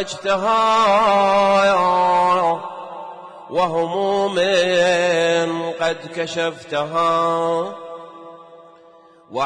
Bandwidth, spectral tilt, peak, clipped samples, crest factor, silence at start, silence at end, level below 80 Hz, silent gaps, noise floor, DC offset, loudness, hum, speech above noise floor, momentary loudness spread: 10.5 kHz; -4 dB/octave; -8 dBFS; under 0.1%; 12 dB; 0 s; 0 s; -58 dBFS; none; -48 dBFS; under 0.1%; -18 LUFS; none; 31 dB; 18 LU